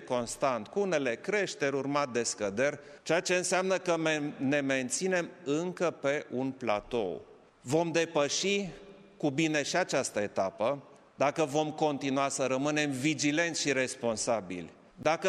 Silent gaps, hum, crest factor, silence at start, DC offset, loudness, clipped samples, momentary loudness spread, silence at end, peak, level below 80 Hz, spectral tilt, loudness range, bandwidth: none; none; 18 dB; 0 s; under 0.1%; -31 LUFS; under 0.1%; 6 LU; 0 s; -12 dBFS; -68 dBFS; -3.5 dB/octave; 2 LU; 13.5 kHz